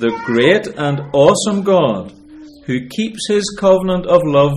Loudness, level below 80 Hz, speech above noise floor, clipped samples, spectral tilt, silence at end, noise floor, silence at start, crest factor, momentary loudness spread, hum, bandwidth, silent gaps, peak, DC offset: -15 LUFS; -46 dBFS; 24 dB; under 0.1%; -5.5 dB/octave; 0 s; -38 dBFS; 0 s; 14 dB; 11 LU; none; 12.5 kHz; none; 0 dBFS; under 0.1%